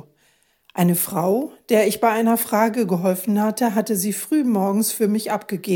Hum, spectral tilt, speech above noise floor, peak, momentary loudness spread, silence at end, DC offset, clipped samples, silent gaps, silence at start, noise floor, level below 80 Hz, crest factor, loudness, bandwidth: none; -5 dB/octave; 42 dB; -4 dBFS; 4 LU; 0 s; under 0.1%; under 0.1%; none; 0.75 s; -62 dBFS; -70 dBFS; 16 dB; -20 LUFS; 17.5 kHz